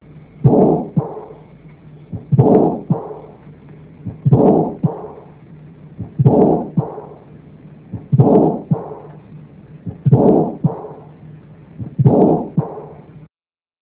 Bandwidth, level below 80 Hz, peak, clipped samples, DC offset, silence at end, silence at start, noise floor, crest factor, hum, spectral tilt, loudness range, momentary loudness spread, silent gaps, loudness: 3.7 kHz; -44 dBFS; 0 dBFS; under 0.1%; under 0.1%; 0.65 s; 0.15 s; under -90 dBFS; 18 dB; none; -14.5 dB/octave; 3 LU; 22 LU; none; -15 LUFS